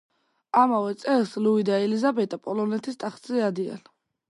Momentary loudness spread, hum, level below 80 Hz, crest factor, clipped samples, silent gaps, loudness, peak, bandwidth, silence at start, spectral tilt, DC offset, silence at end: 11 LU; none; -78 dBFS; 20 dB; under 0.1%; none; -25 LUFS; -6 dBFS; 11.5 kHz; 0.55 s; -6.5 dB/octave; under 0.1%; 0.5 s